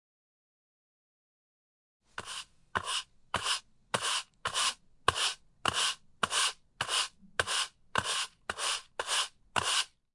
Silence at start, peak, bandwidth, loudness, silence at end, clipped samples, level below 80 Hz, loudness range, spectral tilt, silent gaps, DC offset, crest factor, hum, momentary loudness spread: 2.2 s; -8 dBFS; 11.5 kHz; -32 LUFS; 0.3 s; under 0.1%; -66 dBFS; 7 LU; 0 dB/octave; none; under 0.1%; 28 dB; none; 9 LU